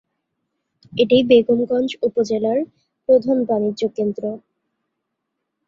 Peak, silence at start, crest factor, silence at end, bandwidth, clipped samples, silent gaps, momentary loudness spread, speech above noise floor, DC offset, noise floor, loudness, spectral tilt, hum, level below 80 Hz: -2 dBFS; 0.9 s; 18 dB; 1.3 s; 7.4 kHz; under 0.1%; none; 15 LU; 60 dB; under 0.1%; -78 dBFS; -18 LUFS; -6 dB/octave; none; -62 dBFS